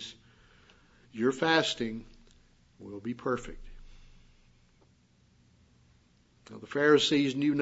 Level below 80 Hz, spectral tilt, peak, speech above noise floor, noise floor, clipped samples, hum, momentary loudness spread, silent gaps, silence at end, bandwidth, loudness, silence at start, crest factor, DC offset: -56 dBFS; -4.5 dB/octave; -10 dBFS; 36 dB; -65 dBFS; under 0.1%; none; 24 LU; none; 0 s; 8 kHz; -28 LUFS; 0 s; 24 dB; under 0.1%